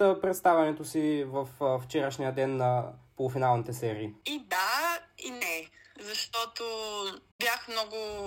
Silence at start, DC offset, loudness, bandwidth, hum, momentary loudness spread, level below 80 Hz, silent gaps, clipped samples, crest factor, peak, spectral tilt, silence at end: 0 s; under 0.1%; -30 LUFS; 16.5 kHz; none; 10 LU; -66 dBFS; 7.32-7.39 s; under 0.1%; 18 dB; -12 dBFS; -4.5 dB/octave; 0 s